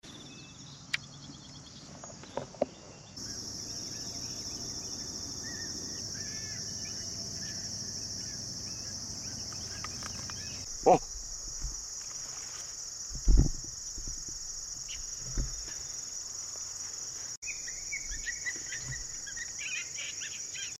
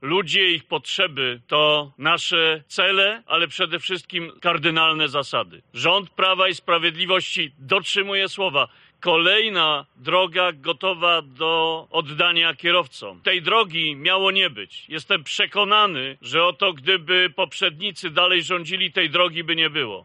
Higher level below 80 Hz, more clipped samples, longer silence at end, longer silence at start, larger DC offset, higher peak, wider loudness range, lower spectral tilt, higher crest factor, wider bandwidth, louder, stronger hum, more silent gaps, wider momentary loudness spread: first, -42 dBFS vs -72 dBFS; neither; about the same, 0 s vs 0.05 s; about the same, 0.05 s vs 0 s; neither; second, -10 dBFS vs -4 dBFS; first, 5 LU vs 1 LU; about the same, -2.5 dB/octave vs -3 dB/octave; first, 26 dB vs 18 dB; first, 14.5 kHz vs 10.5 kHz; second, -35 LUFS vs -19 LUFS; neither; first, 17.37-17.42 s vs none; about the same, 8 LU vs 8 LU